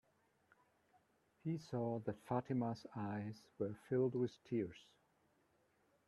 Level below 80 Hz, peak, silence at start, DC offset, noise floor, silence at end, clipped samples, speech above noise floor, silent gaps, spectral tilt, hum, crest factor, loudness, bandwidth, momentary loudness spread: -80 dBFS; -26 dBFS; 1.45 s; under 0.1%; -78 dBFS; 1.25 s; under 0.1%; 36 dB; none; -8.5 dB/octave; none; 20 dB; -43 LUFS; 12 kHz; 9 LU